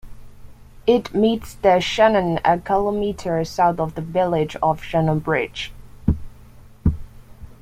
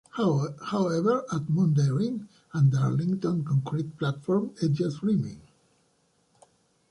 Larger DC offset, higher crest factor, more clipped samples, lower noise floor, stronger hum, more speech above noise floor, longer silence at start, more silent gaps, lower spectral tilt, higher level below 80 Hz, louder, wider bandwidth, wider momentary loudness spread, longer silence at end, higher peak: neither; about the same, 18 dB vs 14 dB; neither; second, -44 dBFS vs -68 dBFS; neither; second, 24 dB vs 43 dB; about the same, 0.05 s vs 0.15 s; neither; second, -6.5 dB/octave vs -8 dB/octave; first, -36 dBFS vs -64 dBFS; first, -20 LUFS vs -27 LUFS; first, 15.5 kHz vs 10.5 kHz; about the same, 9 LU vs 8 LU; second, 0.1 s vs 1.5 s; first, -4 dBFS vs -12 dBFS